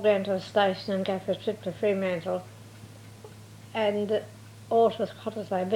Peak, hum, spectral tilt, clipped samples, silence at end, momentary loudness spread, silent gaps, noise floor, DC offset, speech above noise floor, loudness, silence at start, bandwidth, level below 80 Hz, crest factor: -12 dBFS; none; -6 dB/octave; under 0.1%; 0 s; 23 LU; none; -47 dBFS; under 0.1%; 20 dB; -28 LUFS; 0 s; 16.5 kHz; -68 dBFS; 16 dB